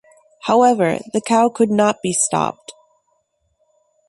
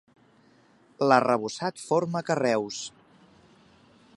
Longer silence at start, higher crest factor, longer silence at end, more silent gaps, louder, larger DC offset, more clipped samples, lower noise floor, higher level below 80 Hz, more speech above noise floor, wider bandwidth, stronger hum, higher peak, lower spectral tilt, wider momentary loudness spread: second, 0.45 s vs 1 s; second, 16 dB vs 26 dB; first, 1.4 s vs 1.25 s; neither; first, -17 LUFS vs -26 LUFS; neither; neither; first, -67 dBFS vs -60 dBFS; first, -62 dBFS vs -74 dBFS; first, 50 dB vs 35 dB; about the same, 11.5 kHz vs 11.5 kHz; neither; about the same, -2 dBFS vs -4 dBFS; about the same, -4 dB/octave vs -5 dB/octave; second, 9 LU vs 13 LU